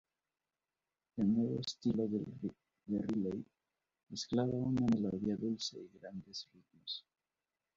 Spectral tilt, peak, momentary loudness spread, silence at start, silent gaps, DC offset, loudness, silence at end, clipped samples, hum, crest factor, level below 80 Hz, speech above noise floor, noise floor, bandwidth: -7 dB/octave; -22 dBFS; 16 LU; 1.15 s; none; under 0.1%; -38 LUFS; 0.75 s; under 0.1%; none; 18 dB; -68 dBFS; over 53 dB; under -90 dBFS; 7.6 kHz